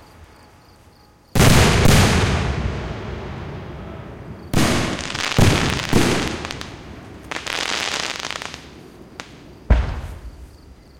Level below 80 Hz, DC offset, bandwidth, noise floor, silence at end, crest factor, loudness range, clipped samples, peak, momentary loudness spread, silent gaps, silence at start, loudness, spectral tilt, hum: -28 dBFS; under 0.1%; 17 kHz; -50 dBFS; 0.25 s; 18 dB; 8 LU; under 0.1%; -2 dBFS; 24 LU; none; 0.2 s; -19 LUFS; -4.5 dB/octave; none